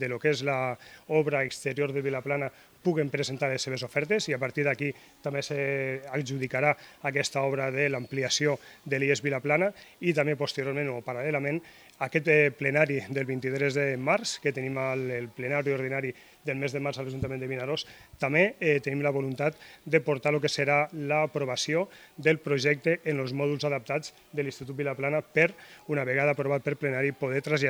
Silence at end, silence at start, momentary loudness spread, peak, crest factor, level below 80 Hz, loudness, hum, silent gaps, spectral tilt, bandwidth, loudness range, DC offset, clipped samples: 0 s; 0 s; 8 LU; -6 dBFS; 22 dB; -64 dBFS; -28 LUFS; none; none; -5 dB/octave; 19.5 kHz; 3 LU; under 0.1%; under 0.1%